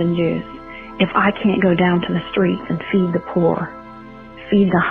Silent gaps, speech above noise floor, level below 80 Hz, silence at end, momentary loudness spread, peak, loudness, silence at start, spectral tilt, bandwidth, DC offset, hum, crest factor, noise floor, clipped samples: none; 20 dB; -48 dBFS; 0 s; 20 LU; -2 dBFS; -18 LUFS; 0 s; -10 dB/octave; 4.4 kHz; under 0.1%; none; 16 dB; -37 dBFS; under 0.1%